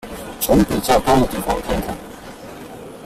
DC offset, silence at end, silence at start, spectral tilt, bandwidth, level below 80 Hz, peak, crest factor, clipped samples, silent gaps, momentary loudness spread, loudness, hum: under 0.1%; 0 s; 0.05 s; -5 dB/octave; 16 kHz; -34 dBFS; -2 dBFS; 18 dB; under 0.1%; none; 20 LU; -18 LUFS; none